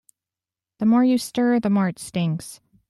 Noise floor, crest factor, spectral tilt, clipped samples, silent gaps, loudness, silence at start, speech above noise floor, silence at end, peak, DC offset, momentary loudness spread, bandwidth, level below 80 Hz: -90 dBFS; 14 dB; -6.5 dB/octave; under 0.1%; none; -21 LUFS; 0.8 s; 70 dB; 0.35 s; -8 dBFS; under 0.1%; 8 LU; 13 kHz; -62 dBFS